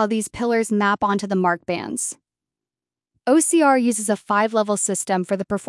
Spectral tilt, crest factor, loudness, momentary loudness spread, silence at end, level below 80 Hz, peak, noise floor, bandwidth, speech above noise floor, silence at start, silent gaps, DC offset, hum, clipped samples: -4 dB/octave; 16 dB; -20 LUFS; 10 LU; 0.05 s; -60 dBFS; -4 dBFS; under -90 dBFS; 12 kHz; over 70 dB; 0 s; none; under 0.1%; none; under 0.1%